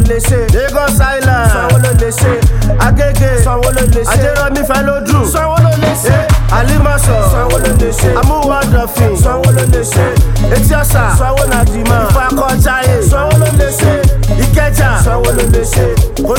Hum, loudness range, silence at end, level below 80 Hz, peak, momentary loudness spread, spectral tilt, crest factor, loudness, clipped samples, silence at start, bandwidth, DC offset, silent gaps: none; 1 LU; 0 s; -14 dBFS; 0 dBFS; 2 LU; -5.5 dB/octave; 8 dB; -10 LUFS; 0.1%; 0 s; 17.5 kHz; under 0.1%; none